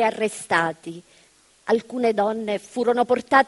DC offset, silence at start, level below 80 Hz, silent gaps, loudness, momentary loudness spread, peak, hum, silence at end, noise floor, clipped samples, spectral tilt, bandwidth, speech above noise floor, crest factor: under 0.1%; 0 s; -68 dBFS; none; -23 LUFS; 16 LU; -2 dBFS; none; 0 s; -57 dBFS; under 0.1%; -4.5 dB/octave; 11.5 kHz; 35 dB; 22 dB